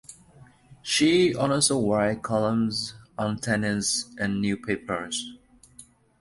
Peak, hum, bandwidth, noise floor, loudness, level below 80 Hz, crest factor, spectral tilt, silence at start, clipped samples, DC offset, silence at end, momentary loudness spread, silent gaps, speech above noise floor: -8 dBFS; none; 11.5 kHz; -53 dBFS; -25 LUFS; -56 dBFS; 18 dB; -4 dB/octave; 0.1 s; under 0.1%; under 0.1%; 0.4 s; 11 LU; none; 29 dB